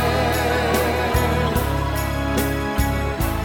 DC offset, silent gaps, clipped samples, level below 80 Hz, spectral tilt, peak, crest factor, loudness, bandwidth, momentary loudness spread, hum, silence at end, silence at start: under 0.1%; none; under 0.1%; -26 dBFS; -5.5 dB/octave; -8 dBFS; 14 dB; -21 LUFS; 18 kHz; 3 LU; none; 0 s; 0 s